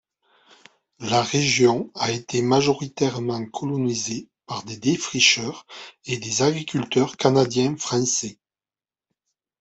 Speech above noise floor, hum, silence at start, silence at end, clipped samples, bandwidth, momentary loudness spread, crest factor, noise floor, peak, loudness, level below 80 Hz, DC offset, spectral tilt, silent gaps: over 68 dB; none; 1 s; 1.3 s; under 0.1%; 8.4 kHz; 15 LU; 20 dB; under -90 dBFS; -4 dBFS; -22 LUFS; -62 dBFS; under 0.1%; -3.5 dB/octave; none